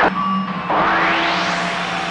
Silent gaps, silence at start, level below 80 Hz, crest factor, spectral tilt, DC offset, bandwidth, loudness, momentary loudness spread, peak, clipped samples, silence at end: none; 0 s; -48 dBFS; 12 dB; -4.5 dB/octave; under 0.1%; 11 kHz; -18 LUFS; 5 LU; -6 dBFS; under 0.1%; 0 s